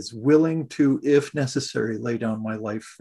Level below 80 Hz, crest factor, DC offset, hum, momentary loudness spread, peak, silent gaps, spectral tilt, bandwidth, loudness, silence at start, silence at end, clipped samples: -64 dBFS; 16 dB; under 0.1%; none; 10 LU; -6 dBFS; none; -6 dB/octave; 12 kHz; -23 LUFS; 0 s; 0.1 s; under 0.1%